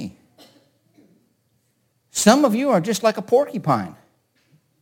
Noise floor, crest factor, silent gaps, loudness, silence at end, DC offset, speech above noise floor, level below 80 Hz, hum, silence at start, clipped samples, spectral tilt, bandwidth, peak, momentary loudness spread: -67 dBFS; 22 dB; none; -19 LUFS; 0.9 s; under 0.1%; 49 dB; -64 dBFS; none; 0 s; under 0.1%; -4.5 dB/octave; 17 kHz; 0 dBFS; 13 LU